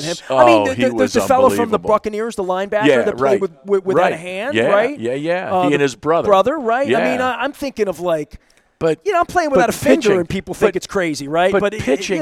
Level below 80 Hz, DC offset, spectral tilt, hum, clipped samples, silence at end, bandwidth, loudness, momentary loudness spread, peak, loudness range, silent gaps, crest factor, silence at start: -48 dBFS; under 0.1%; -5 dB/octave; none; under 0.1%; 0 s; 16 kHz; -16 LUFS; 8 LU; 0 dBFS; 2 LU; none; 16 dB; 0 s